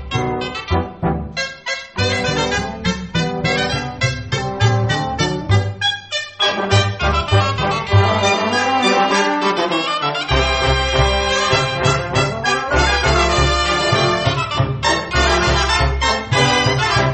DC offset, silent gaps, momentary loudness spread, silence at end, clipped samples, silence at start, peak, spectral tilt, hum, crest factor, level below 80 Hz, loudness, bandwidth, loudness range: under 0.1%; none; 7 LU; 0 s; under 0.1%; 0 s; 0 dBFS; -4.5 dB/octave; none; 16 dB; -28 dBFS; -17 LUFS; 8.8 kHz; 4 LU